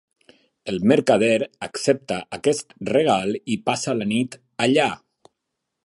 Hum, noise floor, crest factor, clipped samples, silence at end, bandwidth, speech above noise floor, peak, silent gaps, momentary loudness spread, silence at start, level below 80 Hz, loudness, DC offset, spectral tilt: none; -80 dBFS; 20 dB; under 0.1%; 0.9 s; 11.5 kHz; 59 dB; -2 dBFS; none; 11 LU; 0.65 s; -60 dBFS; -22 LUFS; under 0.1%; -4.5 dB/octave